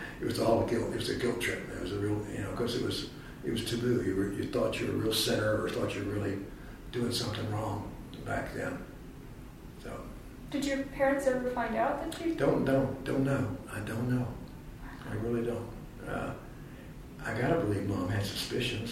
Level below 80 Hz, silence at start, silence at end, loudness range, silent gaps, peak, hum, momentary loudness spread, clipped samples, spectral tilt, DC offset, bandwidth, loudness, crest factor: -50 dBFS; 0 s; 0 s; 6 LU; none; -14 dBFS; none; 17 LU; under 0.1%; -5.5 dB/octave; under 0.1%; 16 kHz; -32 LUFS; 20 dB